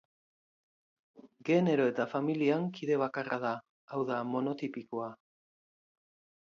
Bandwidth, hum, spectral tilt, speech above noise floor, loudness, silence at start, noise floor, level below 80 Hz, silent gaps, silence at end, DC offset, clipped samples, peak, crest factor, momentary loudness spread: 7.4 kHz; none; -7.5 dB/octave; over 58 dB; -33 LUFS; 1.15 s; under -90 dBFS; -82 dBFS; 3.69-3.88 s; 1.3 s; under 0.1%; under 0.1%; -16 dBFS; 20 dB; 11 LU